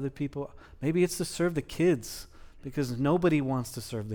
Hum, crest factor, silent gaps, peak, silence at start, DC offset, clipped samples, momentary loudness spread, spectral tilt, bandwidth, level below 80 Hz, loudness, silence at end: none; 16 dB; none; -14 dBFS; 0 s; under 0.1%; under 0.1%; 14 LU; -6 dB/octave; over 20 kHz; -52 dBFS; -29 LUFS; 0 s